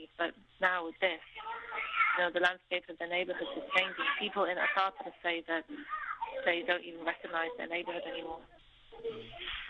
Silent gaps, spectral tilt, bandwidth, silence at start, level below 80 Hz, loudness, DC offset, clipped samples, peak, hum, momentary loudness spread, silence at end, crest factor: none; -4 dB/octave; 9.6 kHz; 0 s; -66 dBFS; -34 LUFS; under 0.1%; under 0.1%; -14 dBFS; none; 13 LU; 0 s; 22 dB